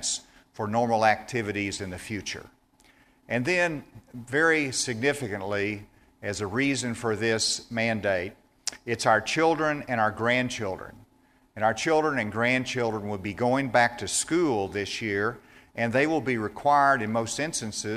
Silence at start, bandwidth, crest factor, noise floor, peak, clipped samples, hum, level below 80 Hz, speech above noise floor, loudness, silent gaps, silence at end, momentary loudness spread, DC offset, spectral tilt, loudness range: 0 s; 15 kHz; 20 dB; -62 dBFS; -6 dBFS; under 0.1%; none; -58 dBFS; 36 dB; -26 LUFS; none; 0 s; 12 LU; under 0.1%; -4 dB/octave; 3 LU